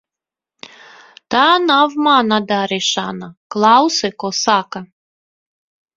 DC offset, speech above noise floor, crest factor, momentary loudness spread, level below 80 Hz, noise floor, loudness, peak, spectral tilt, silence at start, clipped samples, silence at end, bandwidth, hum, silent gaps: under 0.1%; 73 dB; 18 dB; 15 LU; -62 dBFS; -88 dBFS; -14 LUFS; 0 dBFS; -3 dB/octave; 1.3 s; under 0.1%; 1.1 s; 7.8 kHz; none; 3.37-3.50 s